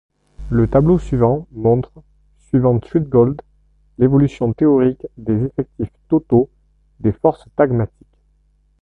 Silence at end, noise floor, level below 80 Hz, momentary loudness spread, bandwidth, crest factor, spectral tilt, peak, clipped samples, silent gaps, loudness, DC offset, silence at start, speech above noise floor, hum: 0.95 s; -58 dBFS; -38 dBFS; 10 LU; 8 kHz; 16 dB; -10.5 dB/octave; 0 dBFS; under 0.1%; none; -17 LUFS; under 0.1%; 0.4 s; 42 dB; 50 Hz at -45 dBFS